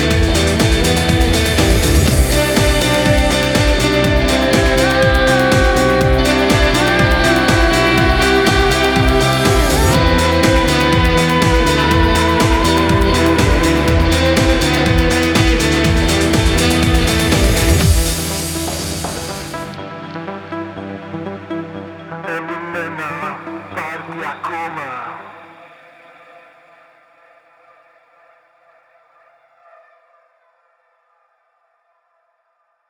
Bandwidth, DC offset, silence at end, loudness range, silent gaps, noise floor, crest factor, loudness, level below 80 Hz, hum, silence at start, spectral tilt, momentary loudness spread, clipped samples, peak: over 20 kHz; under 0.1%; 7.45 s; 14 LU; none; -64 dBFS; 14 dB; -13 LUFS; -22 dBFS; none; 0 s; -4.5 dB/octave; 14 LU; under 0.1%; 0 dBFS